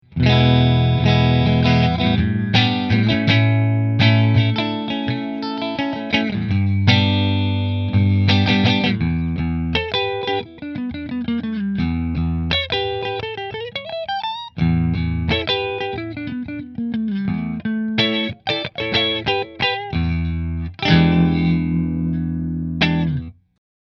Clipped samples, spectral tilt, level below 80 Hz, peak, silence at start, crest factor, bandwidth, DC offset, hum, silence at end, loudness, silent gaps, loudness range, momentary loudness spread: under 0.1%; -7.5 dB/octave; -36 dBFS; 0 dBFS; 0.1 s; 18 dB; 6.4 kHz; under 0.1%; none; 0.5 s; -19 LUFS; none; 6 LU; 11 LU